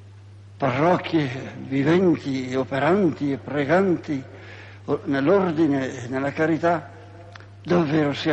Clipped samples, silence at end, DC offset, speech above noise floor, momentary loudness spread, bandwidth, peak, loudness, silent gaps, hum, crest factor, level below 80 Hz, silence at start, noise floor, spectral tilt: under 0.1%; 0 s; under 0.1%; 22 dB; 19 LU; 8.4 kHz; -6 dBFS; -22 LUFS; none; none; 16 dB; -58 dBFS; 0 s; -44 dBFS; -7.5 dB/octave